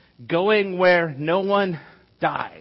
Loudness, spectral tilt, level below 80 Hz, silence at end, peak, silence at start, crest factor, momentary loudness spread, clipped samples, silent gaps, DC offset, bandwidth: -21 LUFS; -10 dB/octave; -64 dBFS; 0 s; -6 dBFS; 0.2 s; 14 dB; 9 LU; under 0.1%; none; under 0.1%; 5.8 kHz